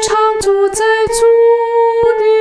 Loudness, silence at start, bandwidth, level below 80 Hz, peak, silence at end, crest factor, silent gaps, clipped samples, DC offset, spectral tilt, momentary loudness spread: -11 LUFS; 0 s; 11 kHz; -40 dBFS; -2 dBFS; 0 s; 8 dB; none; under 0.1%; under 0.1%; -2.5 dB/octave; 3 LU